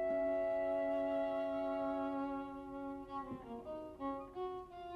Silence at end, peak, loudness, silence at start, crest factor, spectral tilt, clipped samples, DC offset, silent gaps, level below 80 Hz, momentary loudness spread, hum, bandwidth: 0 s; -28 dBFS; -40 LUFS; 0 s; 12 dB; -7 dB/octave; under 0.1%; under 0.1%; none; -66 dBFS; 11 LU; none; 6 kHz